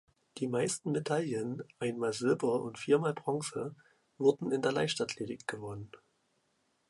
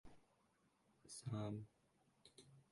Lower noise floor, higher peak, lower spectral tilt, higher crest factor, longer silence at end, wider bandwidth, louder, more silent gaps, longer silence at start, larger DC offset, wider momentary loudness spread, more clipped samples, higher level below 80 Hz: second, -76 dBFS vs -80 dBFS; first, -14 dBFS vs -34 dBFS; about the same, -5 dB/octave vs -6 dB/octave; about the same, 20 dB vs 20 dB; first, 0.95 s vs 0.1 s; about the same, 11.5 kHz vs 11.5 kHz; first, -33 LUFS vs -50 LUFS; neither; first, 0.35 s vs 0.05 s; neither; second, 12 LU vs 19 LU; neither; first, -72 dBFS vs -78 dBFS